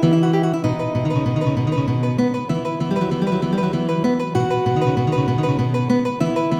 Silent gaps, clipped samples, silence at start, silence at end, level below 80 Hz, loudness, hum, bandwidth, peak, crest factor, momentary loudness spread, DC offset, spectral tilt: none; under 0.1%; 0 s; 0 s; -48 dBFS; -20 LUFS; none; 9.8 kHz; -4 dBFS; 14 dB; 3 LU; under 0.1%; -8 dB/octave